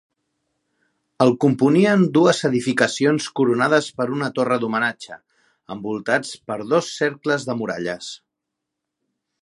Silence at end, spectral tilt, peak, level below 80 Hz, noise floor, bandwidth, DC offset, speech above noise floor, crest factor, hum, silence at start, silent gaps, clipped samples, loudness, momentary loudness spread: 1.25 s; -5.5 dB/octave; 0 dBFS; -66 dBFS; -82 dBFS; 11.5 kHz; under 0.1%; 62 dB; 20 dB; none; 1.2 s; none; under 0.1%; -20 LUFS; 14 LU